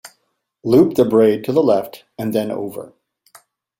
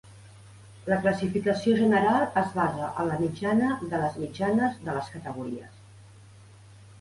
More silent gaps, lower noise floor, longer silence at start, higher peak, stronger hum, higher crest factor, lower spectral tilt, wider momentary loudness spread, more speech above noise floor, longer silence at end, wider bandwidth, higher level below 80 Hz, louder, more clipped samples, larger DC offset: neither; first, -69 dBFS vs -51 dBFS; about the same, 0.05 s vs 0.05 s; first, -2 dBFS vs -10 dBFS; neither; about the same, 16 dB vs 18 dB; about the same, -7.5 dB/octave vs -7 dB/octave; about the same, 16 LU vs 14 LU; first, 53 dB vs 25 dB; first, 0.95 s vs 0.1 s; first, 16.5 kHz vs 11.5 kHz; about the same, -58 dBFS vs -58 dBFS; first, -16 LUFS vs -27 LUFS; neither; neither